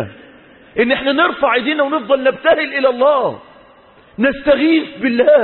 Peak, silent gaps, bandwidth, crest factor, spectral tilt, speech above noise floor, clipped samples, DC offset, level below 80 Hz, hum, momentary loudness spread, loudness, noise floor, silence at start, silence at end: 0 dBFS; none; 4.3 kHz; 14 dB; -10 dB/octave; 32 dB; under 0.1%; under 0.1%; -50 dBFS; none; 8 LU; -15 LUFS; -46 dBFS; 0 s; 0 s